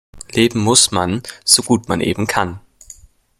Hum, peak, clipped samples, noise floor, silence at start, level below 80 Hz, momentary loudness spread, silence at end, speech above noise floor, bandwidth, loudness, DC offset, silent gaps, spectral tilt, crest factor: none; 0 dBFS; under 0.1%; -43 dBFS; 0.15 s; -48 dBFS; 10 LU; 0.8 s; 27 dB; 16.5 kHz; -15 LUFS; under 0.1%; none; -3 dB/octave; 18 dB